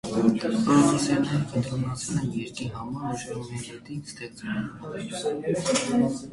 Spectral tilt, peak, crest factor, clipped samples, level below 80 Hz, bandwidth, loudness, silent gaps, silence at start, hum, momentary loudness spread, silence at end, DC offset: -5.5 dB/octave; -8 dBFS; 18 dB; under 0.1%; -54 dBFS; 11.5 kHz; -27 LUFS; none; 0.05 s; none; 15 LU; 0 s; under 0.1%